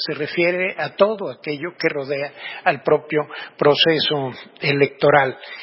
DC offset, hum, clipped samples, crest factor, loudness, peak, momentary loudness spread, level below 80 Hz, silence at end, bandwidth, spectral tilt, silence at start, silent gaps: under 0.1%; none; under 0.1%; 20 dB; -19 LUFS; 0 dBFS; 12 LU; -64 dBFS; 0 s; 5.8 kHz; -9 dB/octave; 0 s; none